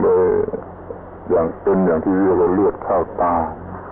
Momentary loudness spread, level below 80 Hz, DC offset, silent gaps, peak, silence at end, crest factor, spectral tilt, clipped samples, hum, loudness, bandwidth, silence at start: 17 LU; -42 dBFS; under 0.1%; none; -6 dBFS; 0 s; 12 dB; -13.5 dB/octave; under 0.1%; none; -18 LUFS; 3 kHz; 0 s